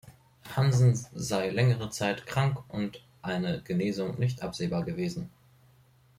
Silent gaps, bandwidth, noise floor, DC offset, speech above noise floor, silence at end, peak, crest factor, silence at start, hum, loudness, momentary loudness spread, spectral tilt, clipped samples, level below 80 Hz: none; 15 kHz; -61 dBFS; under 0.1%; 33 dB; 0.9 s; -10 dBFS; 18 dB; 0.05 s; none; -29 LUFS; 10 LU; -6 dB/octave; under 0.1%; -58 dBFS